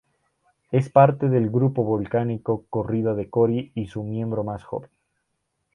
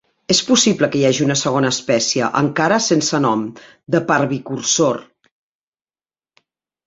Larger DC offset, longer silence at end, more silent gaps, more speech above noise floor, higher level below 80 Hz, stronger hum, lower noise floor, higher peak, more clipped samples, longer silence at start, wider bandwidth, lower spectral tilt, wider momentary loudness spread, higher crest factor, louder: neither; second, 0.9 s vs 1.85 s; neither; second, 54 dB vs over 73 dB; about the same, -56 dBFS vs -58 dBFS; neither; second, -76 dBFS vs under -90 dBFS; about the same, -2 dBFS vs 0 dBFS; neither; first, 0.7 s vs 0.3 s; second, 6.8 kHz vs 8.2 kHz; first, -10 dB/octave vs -3.5 dB/octave; first, 13 LU vs 7 LU; about the same, 20 dB vs 18 dB; second, -23 LUFS vs -16 LUFS